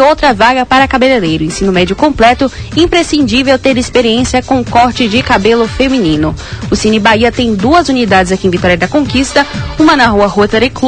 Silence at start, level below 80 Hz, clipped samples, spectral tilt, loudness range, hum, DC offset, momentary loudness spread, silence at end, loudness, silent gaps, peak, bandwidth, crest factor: 0 s; -28 dBFS; 0.8%; -5 dB/octave; 1 LU; none; 0.6%; 4 LU; 0 s; -9 LUFS; none; 0 dBFS; 11 kHz; 8 dB